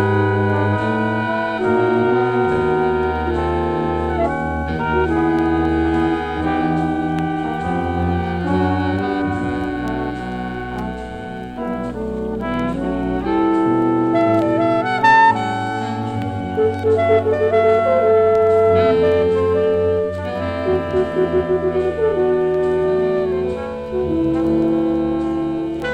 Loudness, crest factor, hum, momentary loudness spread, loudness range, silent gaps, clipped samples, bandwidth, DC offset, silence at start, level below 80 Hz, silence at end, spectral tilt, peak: -18 LUFS; 16 dB; none; 9 LU; 6 LU; none; under 0.1%; 9.4 kHz; under 0.1%; 0 s; -36 dBFS; 0 s; -8 dB/octave; -2 dBFS